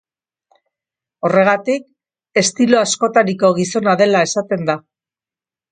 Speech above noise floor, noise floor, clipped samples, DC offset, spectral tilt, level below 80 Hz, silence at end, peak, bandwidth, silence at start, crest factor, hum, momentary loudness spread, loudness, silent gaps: over 75 dB; under -90 dBFS; under 0.1%; under 0.1%; -4 dB/octave; -64 dBFS; 0.9 s; 0 dBFS; 9.6 kHz; 1.25 s; 16 dB; none; 8 LU; -15 LUFS; none